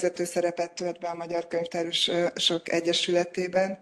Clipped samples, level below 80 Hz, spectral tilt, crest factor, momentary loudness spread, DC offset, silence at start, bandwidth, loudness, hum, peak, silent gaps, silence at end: under 0.1%; -72 dBFS; -3.5 dB/octave; 18 dB; 8 LU; under 0.1%; 0 s; 12.5 kHz; -27 LUFS; none; -10 dBFS; none; 0.05 s